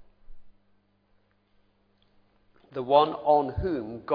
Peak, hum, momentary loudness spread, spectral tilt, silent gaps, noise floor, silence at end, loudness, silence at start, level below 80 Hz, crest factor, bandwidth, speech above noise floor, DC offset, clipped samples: -6 dBFS; 50 Hz at -70 dBFS; 14 LU; -9.5 dB/octave; none; -67 dBFS; 0 s; -25 LUFS; 0.3 s; -50 dBFS; 22 dB; 5.2 kHz; 42 dB; under 0.1%; under 0.1%